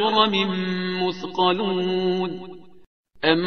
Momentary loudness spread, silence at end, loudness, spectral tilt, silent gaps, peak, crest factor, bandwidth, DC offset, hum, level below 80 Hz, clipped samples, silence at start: 9 LU; 0 s; -23 LUFS; -6.5 dB/octave; 2.87-3.04 s; -2 dBFS; 20 dB; 6.6 kHz; 0.5%; none; -60 dBFS; under 0.1%; 0 s